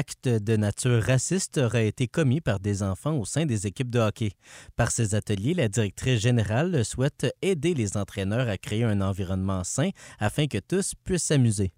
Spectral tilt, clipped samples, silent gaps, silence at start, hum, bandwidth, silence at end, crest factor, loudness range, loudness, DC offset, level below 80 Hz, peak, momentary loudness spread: -5.5 dB/octave; under 0.1%; none; 0 s; none; 16 kHz; 0.1 s; 14 dB; 2 LU; -26 LUFS; under 0.1%; -50 dBFS; -10 dBFS; 5 LU